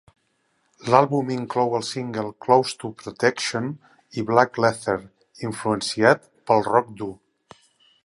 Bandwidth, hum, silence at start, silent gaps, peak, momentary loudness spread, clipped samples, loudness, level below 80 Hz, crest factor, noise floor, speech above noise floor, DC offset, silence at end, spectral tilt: 11.5 kHz; none; 0.85 s; none; 0 dBFS; 15 LU; under 0.1%; -22 LUFS; -62 dBFS; 22 dB; -69 dBFS; 47 dB; under 0.1%; 0.9 s; -5 dB/octave